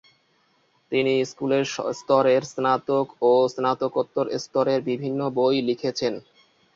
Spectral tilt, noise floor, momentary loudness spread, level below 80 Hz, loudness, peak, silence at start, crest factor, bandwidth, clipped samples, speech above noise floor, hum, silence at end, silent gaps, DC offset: -5.5 dB/octave; -65 dBFS; 7 LU; -68 dBFS; -23 LUFS; -6 dBFS; 0.9 s; 18 dB; 7.6 kHz; under 0.1%; 42 dB; none; 0.55 s; none; under 0.1%